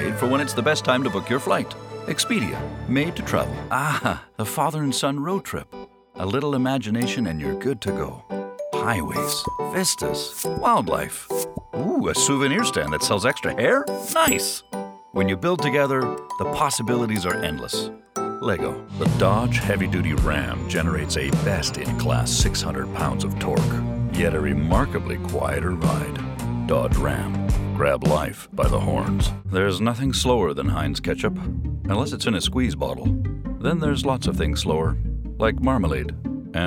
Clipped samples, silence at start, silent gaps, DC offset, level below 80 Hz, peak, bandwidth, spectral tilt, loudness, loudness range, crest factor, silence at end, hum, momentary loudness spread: under 0.1%; 0 s; none; under 0.1%; -34 dBFS; -4 dBFS; 18 kHz; -5 dB/octave; -23 LUFS; 3 LU; 20 dB; 0 s; none; 8 LU